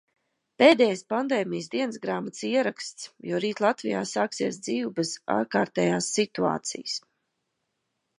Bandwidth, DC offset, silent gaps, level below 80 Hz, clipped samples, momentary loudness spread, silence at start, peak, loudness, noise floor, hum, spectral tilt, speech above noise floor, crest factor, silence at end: 11.5 kHz; under 0.1%; none; -74 dBFS; under 0.1%; 10 LU; 0.6 s; -4 dBFS; -26 LUFS; -79 dBFS; none; -4 dB/octave; 53 dB; 24 dB; 1.2 s